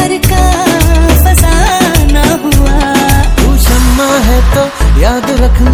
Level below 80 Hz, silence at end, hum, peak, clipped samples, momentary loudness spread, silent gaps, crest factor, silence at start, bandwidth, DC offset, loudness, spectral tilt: -10 dBFS; 0 s; none; 0 dBFS; 2%; 3 LU; none; 6 dB; 0 s; 19 kHz; under 0.1%; -9 LUFS; -5 dB/octave